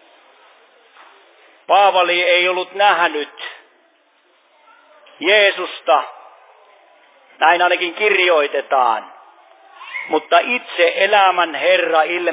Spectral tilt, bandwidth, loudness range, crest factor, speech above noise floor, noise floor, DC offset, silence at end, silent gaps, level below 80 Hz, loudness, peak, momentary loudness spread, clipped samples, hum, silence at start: -5 dB/octave; 4 kHz; 3 LU; 18 dB; 42 dB; -57 dBFS; under 0.1%; 0 s; none; under -90 dBFS; -15 LUFS; 0 dBFS; 11 LU; under 0.1%; none; 1.7 s